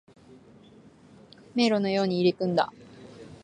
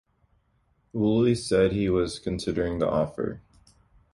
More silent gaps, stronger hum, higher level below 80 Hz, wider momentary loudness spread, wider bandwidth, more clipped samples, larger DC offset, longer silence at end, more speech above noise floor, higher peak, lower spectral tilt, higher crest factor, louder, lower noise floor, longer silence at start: neither; neither; second, -68 dBFS vs -46 dBFS; first, 23 LU vs 11 LU; second, 9.8 kHz vs 11.5 kHz; neither; neither; second, 0.1 s vs 0.75 s; second, 29 dB vs 43 dB; about the same, -10 dBFS vs -10 dBFS; about the same, -6 dB/octave vs -6.5 dB/octave; about the same, 18 dB vs 16 dB; about the same, -26 LUFS vs -26 LUFS; second, -53 dBFS vs -68 dBFS; first, 1.55 s vs 0.95 s